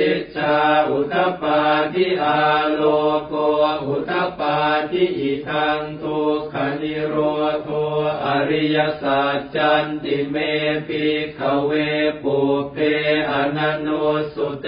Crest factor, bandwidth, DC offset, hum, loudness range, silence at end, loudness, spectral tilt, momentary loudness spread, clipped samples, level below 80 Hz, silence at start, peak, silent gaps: 14 dB; 5.2 kHz; under 0.1%; none; 3 LU; 0 s; -20 LUFS; -10.5 dB/octave; 5 LU; under 0.1%; -54 dBFS; 0 s; -6 dBFS; none